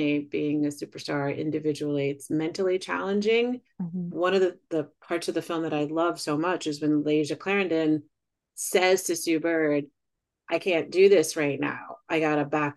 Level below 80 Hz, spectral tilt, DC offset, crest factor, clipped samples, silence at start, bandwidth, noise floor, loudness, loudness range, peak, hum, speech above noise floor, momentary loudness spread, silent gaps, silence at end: -76 dBFS; -4.5 dB/octave; under 0.1%; 18 dB; under 0.1%; 0 s; 12.5 kHz; -83 dBFS; -26 LUFS; 3 LU; -8 dBFS; none; 57 dB; 10 LU; none; 0.05 s